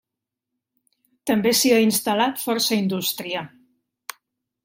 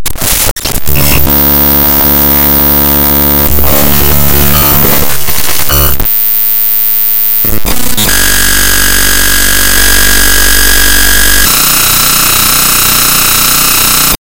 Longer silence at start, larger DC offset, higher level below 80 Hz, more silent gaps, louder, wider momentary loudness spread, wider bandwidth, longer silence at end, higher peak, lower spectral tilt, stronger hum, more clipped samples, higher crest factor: first, 1.25 s vs 0 s; neither; second, -68 dBFS vs -18 dBFS; second, none vs 0.51-0.56 s; second, -20 LUFS vs -5 LUFS; first, 22 LU vs 5 LU; second, 16.5 kHz vs over 20 kHz; first, 1.2 s vs 0.1 s; second, -6 dBFS vs 0 dBFS; first, -3.5 dB/octave vs -2 dB/octave; neither; second, under 0.1% vs 4%; first, 18 dB vs 8 dB